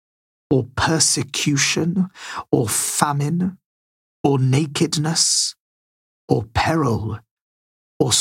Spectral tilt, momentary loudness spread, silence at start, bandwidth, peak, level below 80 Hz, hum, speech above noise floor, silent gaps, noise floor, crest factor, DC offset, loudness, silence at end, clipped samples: -3.5 dB/octave; 8 LU; 0.5 s; 16.5 kHz; 0 dBFS; -48 dBFS; none; over 71 dB; 3.66-4.24 s, 5.60-6.28 s, 7.31-8.00 s; under -90 dBFS; 20 dB; under 0.1%; -19 LUFS; 0 s; under 0.1%